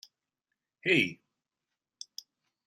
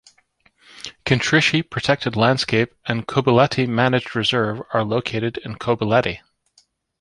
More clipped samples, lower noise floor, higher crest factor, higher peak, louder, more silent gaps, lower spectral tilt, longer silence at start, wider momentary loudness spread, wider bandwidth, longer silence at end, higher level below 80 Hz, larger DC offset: neither; first, -89 dBFS vs -60 dBFS; about the same, 24 dB vs 20 dB; second, -12 dBFS vs -2 dBFS; second, -28 LUFS vs -19 LUFS; neither; second, -4 dB/octave vs -5.5 dB/octave; about the same, 0.85 s vs 0.75 s; first, 22 LU vs 10 LU; first, 15 kHz vs 11 kHz; first, 1.55 s vs 0.85 s; second, -78 dBFS vs -50 dBFS; neither